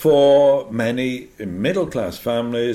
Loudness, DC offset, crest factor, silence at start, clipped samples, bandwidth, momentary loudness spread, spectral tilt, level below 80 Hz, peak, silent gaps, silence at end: -18 LUFS; under 0.1%; 12 dB; 0 s; under 0.1%; 15.5 kHz; 12 LU; -6 dB/octave; -52 dBFS; -4 dBFS; none; 0 s